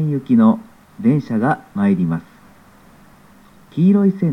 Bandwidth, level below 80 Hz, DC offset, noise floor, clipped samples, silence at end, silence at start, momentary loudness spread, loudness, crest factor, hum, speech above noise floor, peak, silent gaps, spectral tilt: 5.6 kHz; -58 dBFS; 0.2%; -47 dBFS; under 0.1%; 0 s; 0 s; 9 LU; -17 LUFS; 16 dB; none; 32 dB; -2 dBFS; none; -10 dB/octave